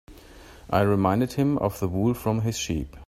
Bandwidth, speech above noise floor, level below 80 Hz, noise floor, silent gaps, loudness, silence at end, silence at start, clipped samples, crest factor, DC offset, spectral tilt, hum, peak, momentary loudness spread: 16 kHz; 23 dB; -46 dBFS; -47 dBFS; none; -25 LUFS; 0 s; 0.1 s; under 0.1%; 20 dB; under 0.1%; -6.5 dB/octave; none; -6 dBFS; 5 LU